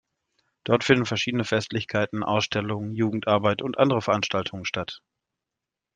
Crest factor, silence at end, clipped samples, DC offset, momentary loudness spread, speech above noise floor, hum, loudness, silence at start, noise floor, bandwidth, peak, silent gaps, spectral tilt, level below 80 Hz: 22 dB; 1 s; under 0.1%; under 0.1%; 9 LU; 62 dB; none; -25 LUFS; 0.65 s; -87 dBFS; 9.4 kHz; -4 dBFS; none; -5.5 dB/octave; -62 dBFS